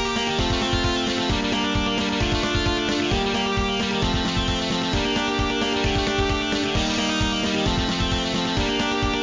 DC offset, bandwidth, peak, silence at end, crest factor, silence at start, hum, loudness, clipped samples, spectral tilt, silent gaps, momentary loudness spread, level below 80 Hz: under 0.1%; 7.6 kHz; -10 dBFS; 0 s; 14 dB; 0 s; none; -22 LUFS; under 0.1%; -4 dB/octave; none; 1 LU; -32 dBFS